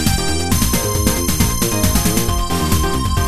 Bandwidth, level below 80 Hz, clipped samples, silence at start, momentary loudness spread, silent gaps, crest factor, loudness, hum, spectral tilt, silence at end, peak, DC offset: 14.5 kHz; -22 dBFS; under 0.1%; 0 s; 3 LU; none; 16 dB; -16 LUFS; none; -4 dB/octave; 0 s; 0 dBFS; under 0.1%